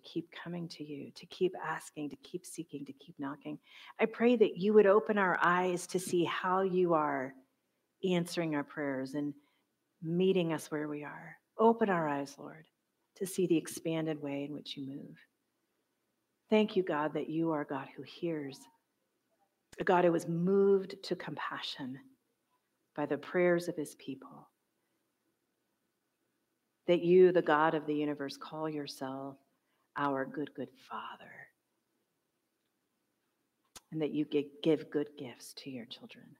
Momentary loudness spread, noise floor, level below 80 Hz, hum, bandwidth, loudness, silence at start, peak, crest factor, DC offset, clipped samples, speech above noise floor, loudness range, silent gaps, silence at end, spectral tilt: 18 LU; -82 dBFS; -84 dBFS; none; 16 kHz; -33 LUFS; 0.05 s; -14 dBFS; 22 dB; under 0.1%; under 0.1%; 50 dB; 11 LU; none; 0.2 s; -6 dB/octave